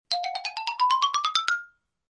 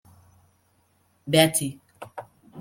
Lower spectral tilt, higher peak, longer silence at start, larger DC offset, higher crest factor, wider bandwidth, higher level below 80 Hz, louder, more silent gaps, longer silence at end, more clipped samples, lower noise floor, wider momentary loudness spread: second, 3 dB/octave vs -3.5 dB/octave; about the same, -6 dBFS vs -4 dBFS; second, 0.1 s vs 1.25 s; neither; about the same, 20 dB vs 24 dB; second, 11 kHz vs 16.5 kHz; second, -78 dBFS vs -64 dBFS; second, -25 LUFS vs -22 LUFS; neither; first, 0.45 s vs 0 s; neither; second, -47 dBFS vs -66 dBFS; second, 8 LU vs 24 LU